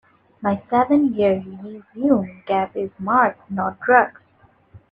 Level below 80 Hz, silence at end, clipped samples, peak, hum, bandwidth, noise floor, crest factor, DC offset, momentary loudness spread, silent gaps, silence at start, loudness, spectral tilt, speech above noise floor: -60 dBFS; 0.15 s; under 0.1%; 0 dBFS; none; 4.7 kHz; -56 dBFS; 20 dB; under 0.1%; 11 LU; none; 0.4 s; -20 LUFS; -9 dB/octave; 37 dB